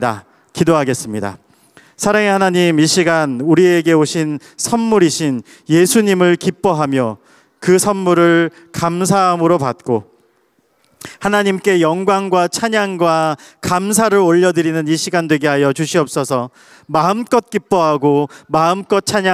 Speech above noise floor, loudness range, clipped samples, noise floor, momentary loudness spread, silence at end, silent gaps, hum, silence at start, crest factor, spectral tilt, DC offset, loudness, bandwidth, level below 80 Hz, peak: 45 dB; 3 LU; under 0.1%; -59 dBFS; 9 LU; 0 s; none; none; 0 s; 14 dB; -5 dB/octave; under 0.1%; -14 LUFS; 15.5 kHz; -56 dBFS; -2 dBFS